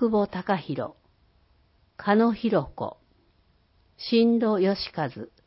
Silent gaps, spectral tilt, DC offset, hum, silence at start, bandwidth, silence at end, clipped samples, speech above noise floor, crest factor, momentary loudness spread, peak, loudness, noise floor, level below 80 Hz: none; -10.5 dB/octave; under 0.1%; none; 0 s; 5.8 kHz; 0.2 s; under 0.1%; 39 dB; 18 dB; 14 LU; -8 dBFS; -25 LUFS; -64 dBFS; -58 dBFS